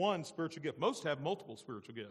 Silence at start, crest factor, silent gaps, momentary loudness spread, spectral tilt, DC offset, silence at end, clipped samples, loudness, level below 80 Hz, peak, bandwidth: 0 s; 18 dB; none; 12 LU; -5 dB/octave; under 0.1%; 0 s; under 0.1%; -39 LUFS; -82 dBFS; -20 dBFS; 13.5 kHz